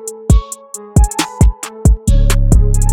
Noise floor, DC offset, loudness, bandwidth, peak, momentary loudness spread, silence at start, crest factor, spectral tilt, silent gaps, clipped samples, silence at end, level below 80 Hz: -30 dBFS; under 0.1%; -14 LUFS; 16 kHz; 0 dBFS; 4 LU; 0 s; 10 dB; -5.5 dB/octave; none; under 0.1%; 0 s; -12 dBFS